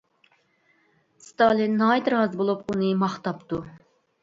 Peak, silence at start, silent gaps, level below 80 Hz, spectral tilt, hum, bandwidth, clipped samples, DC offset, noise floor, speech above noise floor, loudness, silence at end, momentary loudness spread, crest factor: -6 dBFS; 1.4 s; none; -62 dBFS; -7 dB/octave; none; 7.8 kHz; under 0.1%; under 0.1%; -65 dBFS; 42 dB; -24 LUFS; 0.45 s; 12 LU; 20 dB